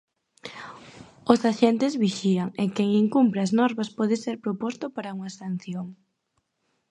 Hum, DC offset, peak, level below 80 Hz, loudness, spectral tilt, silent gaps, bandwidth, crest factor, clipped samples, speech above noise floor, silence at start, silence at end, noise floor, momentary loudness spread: none; under 0.1%; -2 dBFS; -68 dBFS; -25 LUFS; -6.5 dB/octave; none; 11 kHz; 24 dB; under 0.1%; 51 dB; 0.45 s; 0.95 s; -75 dBFS; 19 LU